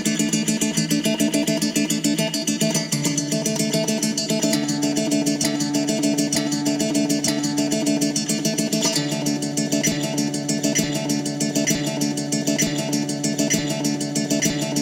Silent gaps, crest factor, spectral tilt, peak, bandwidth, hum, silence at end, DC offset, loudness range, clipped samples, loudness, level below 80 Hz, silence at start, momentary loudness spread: none; 16 dB; -3.5 dB/octave; -6 dBFS; 17 kHz; none; 0 s; under 0.1%; 1 LU; under 0.1%; -21 LUFS; -56 dBFS; 0 s; 3 LU